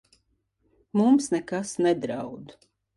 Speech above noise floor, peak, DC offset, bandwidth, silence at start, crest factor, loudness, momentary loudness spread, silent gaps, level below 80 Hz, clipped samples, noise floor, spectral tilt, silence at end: 47 dB; -10 dBFS; under 0.1%; 11.5 kHz; 0.95 s; 16 dB; -25 LUFS; 15 LU; none; -68 dBFS; under 0.1%; -71 dBFS; -5.5 dB/octave; 0.45 s